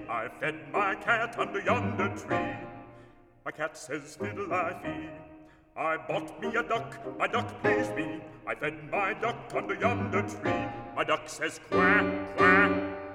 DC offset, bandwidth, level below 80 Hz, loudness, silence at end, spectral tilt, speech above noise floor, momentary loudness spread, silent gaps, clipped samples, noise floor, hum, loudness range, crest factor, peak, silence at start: under 0.1%; 15 kHz; -60 dBFS; -29 LUFS; 0 s; -5.5 dB/octave; 24 dB; 15 LU; none; under 0.1%; -55 dBFS; none; 8 LU; 24 dB; -8 dBFS; 0 s